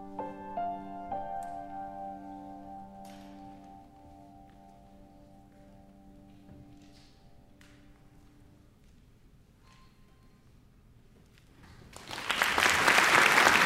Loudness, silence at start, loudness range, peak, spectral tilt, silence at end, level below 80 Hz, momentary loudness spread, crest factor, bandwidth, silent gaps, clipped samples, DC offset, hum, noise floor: -27 LUFS; 0 s; 29 LU; -6 dBFS; -1.5 dB/octave; 0 s; -60 dBFS; 28 LU; 28 dB; 16 kHz; none; under 0.1%; under 0.1%; none; -59 dBFS